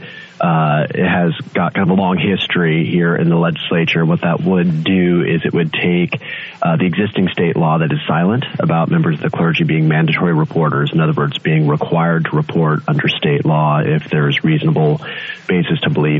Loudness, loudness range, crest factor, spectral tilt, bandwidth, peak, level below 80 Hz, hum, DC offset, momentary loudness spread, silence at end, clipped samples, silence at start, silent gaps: -15 LUFS; 1 LU; 14 dB; -9 dB/octave; 4.1 kHz; -2 dBFS; -52 dBFS; none; under 0.1%; 3 LU; 0 s; under 0.1%; 0 s; none